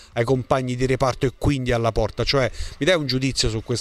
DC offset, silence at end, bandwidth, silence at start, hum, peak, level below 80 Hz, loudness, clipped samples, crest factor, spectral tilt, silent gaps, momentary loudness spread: under 0.1%; 0 s; 13.5 kHz; 0 s; none; -4 dBFS; -34 dBFS; -22 LUFS; under 0.1%; 18 dB; -5 dB/octave; none; 3 LU